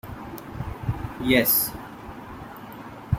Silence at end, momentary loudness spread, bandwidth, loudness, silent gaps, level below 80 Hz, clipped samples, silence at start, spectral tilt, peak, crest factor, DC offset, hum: 0 s; 21 LU; 16.5 kHz; -23 LUFS; none; -44 dBFS; under 0.1%; 0.05 s; -4.5 dB/octave; -4 dBFS; 22 dB; under 0.1%; none